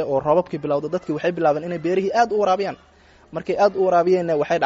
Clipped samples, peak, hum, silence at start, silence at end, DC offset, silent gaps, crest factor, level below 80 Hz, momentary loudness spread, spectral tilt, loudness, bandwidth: under 0.1%; -4 dBFS; none; 0 s; 0 s; under 0.1%; none; 16 dB; -56 dBFS; 9 LU; -5 dB/octave; -20 LUFS; 7.8 kHz